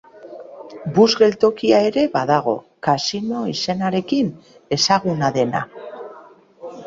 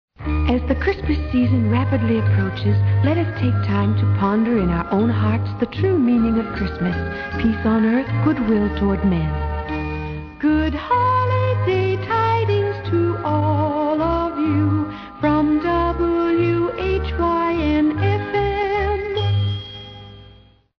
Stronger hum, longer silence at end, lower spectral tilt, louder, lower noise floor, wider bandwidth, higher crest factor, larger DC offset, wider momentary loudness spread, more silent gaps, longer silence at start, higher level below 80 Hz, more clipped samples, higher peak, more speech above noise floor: neither; second, 0 s vs 0.5 s; second, -5 dB/octave vs -9.5 dB/octave; about the same, -18 LUFS vs -19 LUFS; about the same, -45 dBFS vs -48 dBFS; first, 7.8 kHz vs 5.4 kHz; about the same, 18 dB vs 14 dB; neither; first, 22 LU vs 6 LU; neither; about the same, 0.15 s vs 0.2 s; second, -58 dBFS vs -32 dBFS; neither; about the same, -2 dBFS vs -4 dBFS; about the same, 27 dB vs 30 dB